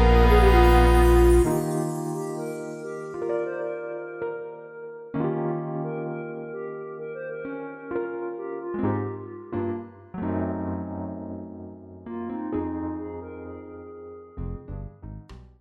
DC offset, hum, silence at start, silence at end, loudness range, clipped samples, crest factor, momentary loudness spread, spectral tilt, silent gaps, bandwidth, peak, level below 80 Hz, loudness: under 0.1%; none; 0 s; 0.15 s; 12 LU; under 0.1%; 20 dB; 22 LU; -7 dB/octave; none; 16 kHz; -6 dBFS; -30 dBFS; -26 LUFS